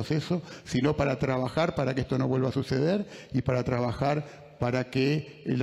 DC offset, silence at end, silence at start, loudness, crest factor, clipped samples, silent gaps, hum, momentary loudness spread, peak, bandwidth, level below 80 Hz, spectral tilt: under 0.1%; 0 s; 0 s; -28 LUFS; 16 dB; under 0.1%; none; none; 6 LU; -12 dBFS; 12 kHz; -54 dBFS; -7 dB/octave